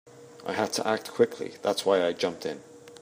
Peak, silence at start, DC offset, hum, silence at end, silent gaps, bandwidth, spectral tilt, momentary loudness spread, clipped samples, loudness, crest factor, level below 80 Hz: -8 dBFS; 0.05 s; under 0.1%; none; 0.05 s; none; 15.5 kHz; -3.5 dB/octave; 12 LU; under 0.1%; -28 LUFS; 20 dB; -76 dBFS